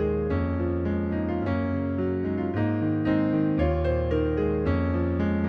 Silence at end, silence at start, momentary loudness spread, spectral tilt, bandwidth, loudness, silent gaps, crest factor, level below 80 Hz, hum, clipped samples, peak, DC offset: 0 s; 0 s; 3 LU; -10.5 dB/octave; 5.2 kHz; -26 LUFS; none; 12 dB; -36 dBFS; none; under 0.1%; -12 dBFS; under 0.1%